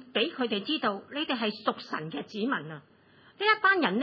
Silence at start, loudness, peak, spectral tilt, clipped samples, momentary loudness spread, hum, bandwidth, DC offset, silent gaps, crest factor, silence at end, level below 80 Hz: 0 s; -29 LUFS; -10 dBFS; -6 dB/octave; under 0.1%; 12 LU; none; 6 kHz; under 0.1%; none; 20 dB; 0 s; -84 dBFS